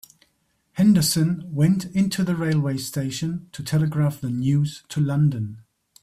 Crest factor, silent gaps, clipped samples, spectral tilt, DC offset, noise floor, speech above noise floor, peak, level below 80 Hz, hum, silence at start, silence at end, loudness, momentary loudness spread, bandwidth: 14 dB; none; under 0.1%; -6 dB/octave; under 0.1%; -68 dBFS; 47 dB; -8 dBFS; -56 dBFS; none; 0.75 s; 0.4 s; -22 LUFS; 10 LU; 15.5 kHz